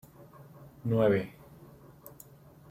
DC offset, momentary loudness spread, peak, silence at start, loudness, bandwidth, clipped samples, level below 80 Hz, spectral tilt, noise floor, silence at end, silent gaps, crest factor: under 0.1%; 27 LU; -14 dBFS; 0.2 s; -29 LUFS; 16.5 kHz; under 0.1%; -64 dBFS; -8 dB/octave; -54 dBFS; 0.6 s; none; 20 dB